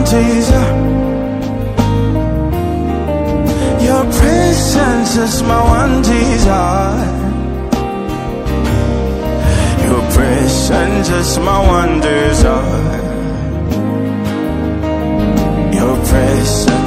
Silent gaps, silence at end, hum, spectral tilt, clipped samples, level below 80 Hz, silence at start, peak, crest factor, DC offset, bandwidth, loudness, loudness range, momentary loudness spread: none; 0 s; none; -5.5 dB/octave; 0.2%; -18 dBFS; 0 s; 0 dBFS; 12 dB; under 0.1%; 16 kHz; -13 LUFS; 4 LU; 6 LU